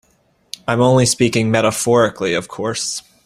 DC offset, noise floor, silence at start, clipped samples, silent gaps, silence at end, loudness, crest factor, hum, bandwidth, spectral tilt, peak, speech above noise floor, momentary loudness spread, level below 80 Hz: under 0.1%; -59 dBFS; 0.7 s; under 0.1%; none; 0.25 s; -16 LUFS; 16 dB; none; 15.5 kHz; -4.5 dB/octave; 0 dBFS; 43 dB; 10 LU; -50 dBFS